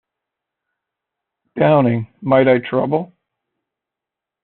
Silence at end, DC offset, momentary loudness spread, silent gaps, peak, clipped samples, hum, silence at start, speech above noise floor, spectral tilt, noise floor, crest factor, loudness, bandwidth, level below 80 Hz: 1.4 s; under 0.1%; 12 LU; none; -2 dBFS; under 0.1%; none; 1.55 s; 70 dB; -6.5 dB/octave; -85 dBFS; 18 dB; -16 LUFS; 4.3 kHz; -60 dBFS